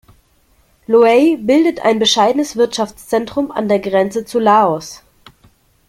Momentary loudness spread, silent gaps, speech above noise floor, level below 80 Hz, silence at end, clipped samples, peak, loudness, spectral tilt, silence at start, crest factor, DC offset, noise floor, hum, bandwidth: 9 LU; none; 41 dB; -54 dBFS; 0.95 s; under 0.1%; -2 dBFS; -14 LUFS; -4 dB/octave; 0.9 s; 14 dB; under 0.1%; -55 dBFS; none; 15.5 kHz